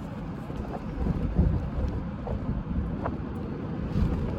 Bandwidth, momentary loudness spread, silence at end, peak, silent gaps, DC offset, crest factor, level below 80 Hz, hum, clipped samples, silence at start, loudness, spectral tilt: 7.2 kHz; 9 LU; 0 s; -12 dBFS; none; under 0.1%; 16 dB; -34 dBFS; none; under 0.1%; 0 s; -31 LUFS; -9.5 dB/octave